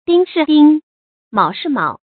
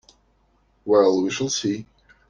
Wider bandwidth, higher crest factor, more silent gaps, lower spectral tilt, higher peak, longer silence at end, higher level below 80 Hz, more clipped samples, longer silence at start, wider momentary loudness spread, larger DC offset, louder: second, 4.6 kHz vs 10 kHz; about the same, 14 dB vs 18 dB; first, 0.83-1.31 s vs none; first, -10.5 dB/octave vs -4 dB/octave; first, 0 dBFS vs -6 dBFS; second, 0.25 s vs 0.45 s; about the same, -62 dBFS vs -62 dBFS; neither; second, 0.1 s vs 0.85 s; second, 9 LU vs 14 LU; neither; first, -14 LUFS vs -21 LUFS